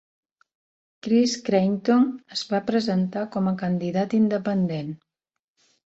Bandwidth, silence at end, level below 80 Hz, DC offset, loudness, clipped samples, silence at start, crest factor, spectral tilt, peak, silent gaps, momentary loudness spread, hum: 8 kHz; 0.9 s; -66 dBFS; under 0.1%; -23 LUFS; under 0.1%; 1.05 s; 16 dB; -6.5 dB/octave; -8 dBFS; none; 9 LU; none